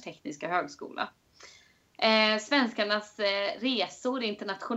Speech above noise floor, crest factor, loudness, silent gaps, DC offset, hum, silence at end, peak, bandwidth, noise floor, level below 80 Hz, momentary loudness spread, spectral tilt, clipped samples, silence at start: 30 dB; 20 dB; -29 LUFS; none; under 0.1%; none; 0 s; -10 dBFS; 8.2 kHz; -59 dBFS; -76 dBFS; 14 LU; -3.5 dB/octave; under 0.1%; 0.05 s